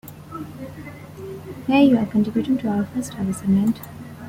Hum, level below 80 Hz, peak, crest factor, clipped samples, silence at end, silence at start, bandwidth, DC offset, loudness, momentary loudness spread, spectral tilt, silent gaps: none; -54 dBFS; -4 dBFS; 18 dB; under 0.1%; 0 s; 0.05 s; 16.5 kHz; under 0.1%; -21 LUFS; 20 LU; -6.5 dB/octave; none